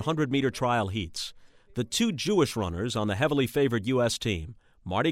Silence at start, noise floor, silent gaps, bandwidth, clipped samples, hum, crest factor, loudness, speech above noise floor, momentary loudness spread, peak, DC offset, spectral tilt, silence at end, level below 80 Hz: 0 s; -48 dBFS; none; 16 kHz; under 0.1%; none; 18 dB; -28 LUFS; 22 dB; 10 LU; -10 dBFS; under 0.1%; -5 dB/octave; 0 s; -52 dBFS